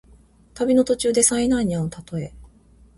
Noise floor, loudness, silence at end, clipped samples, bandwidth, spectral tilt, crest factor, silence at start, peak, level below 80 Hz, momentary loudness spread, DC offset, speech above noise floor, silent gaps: -52 dBFS; -20 LUFS; 0.5 s; under 0.1%; 11.5 kHz; -4.5 dB/octave; 20 dB; 0.55 s; -2 dBFS; -46 dBFS; 14 LU; under 0.1%; 32 dB; none